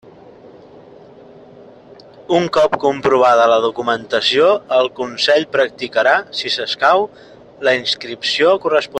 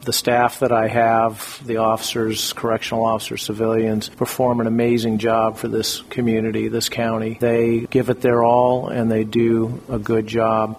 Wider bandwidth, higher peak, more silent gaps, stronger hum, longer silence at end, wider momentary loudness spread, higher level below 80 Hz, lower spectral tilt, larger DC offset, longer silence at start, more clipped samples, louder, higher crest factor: second, 9.6 kHz vs 16 kHz; about the same, 0 dBFS vs -2 dBFS; neither; neither; about the same, 0 s vs 0 s; about the same, 7 LU vs 6 LU; second, -58 dBFS vs -50 dBFS; second, -3.5 dB/octave vs -5 dB/octave; neither; first, 2.3 s vs 0 s; neither; first, -15 LUFS vs -19 LUFS; about the same, 16 dB vs 18 dB